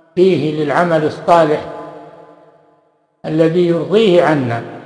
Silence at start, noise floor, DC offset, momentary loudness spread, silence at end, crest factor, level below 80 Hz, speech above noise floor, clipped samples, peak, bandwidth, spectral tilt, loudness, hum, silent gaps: 0.15 s; -57 dBFS; under 0.1%; 15 LU; 0 s; 14 dB; -58 dBFS; 44 dB; under 0.1%; 0 dBFS; 10.5 kHz; -7 dB/octave; -14 LUFS; none; none